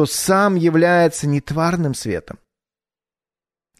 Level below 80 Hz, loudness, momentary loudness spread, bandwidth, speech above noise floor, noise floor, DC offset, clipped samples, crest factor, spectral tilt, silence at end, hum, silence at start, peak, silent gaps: -50 dBFS; -17 LUFS; 10 LU; 13.5 kHz; over 73 dB; under -90 dBFS; under 0.1%; under 0.1%; 16 dB; -5.5 dB/octave; 1.45 s; none; 0 s; -4 dBFS; none